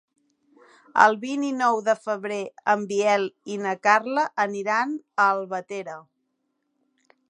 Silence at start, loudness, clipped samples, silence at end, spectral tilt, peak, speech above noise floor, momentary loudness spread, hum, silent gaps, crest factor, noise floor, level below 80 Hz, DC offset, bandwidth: 0.95 s; -23 LUFS; under 0.1%; 1.3 s; -4 dB/octave; 0 dBFS; 52 dB; 12 LU; none; none; 24 dB; -75 dBFS; -80 dBFS; under 0.1%; 10.5 kHz